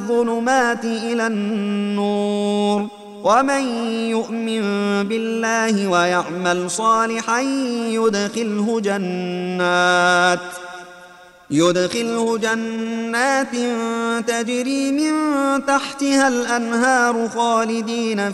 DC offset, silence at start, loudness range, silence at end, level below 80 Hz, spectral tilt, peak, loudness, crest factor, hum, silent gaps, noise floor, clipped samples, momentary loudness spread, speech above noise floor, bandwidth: under 0.1%; 0 s; 2 LU; 0 s; -64 dBFS; -4 dB/octave; -2 dBFS; -19 LUFS; 16 dB; none; none; -44 dBFS; under 0.1%; 6 LU; 25 dB; 13 kHz